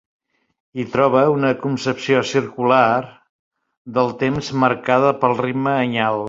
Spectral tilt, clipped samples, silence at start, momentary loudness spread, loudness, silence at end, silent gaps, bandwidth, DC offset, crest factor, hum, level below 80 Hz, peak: -6 dB/octave; under 0.1%; 0.75 s; 8 LU; -18 LUFS; 0 s; 3.29-3.51 s, 3.77-3.85 s; 7.8 kHz; under 0.1%; 16 dB; none; -56 dBFS; -2 dBFS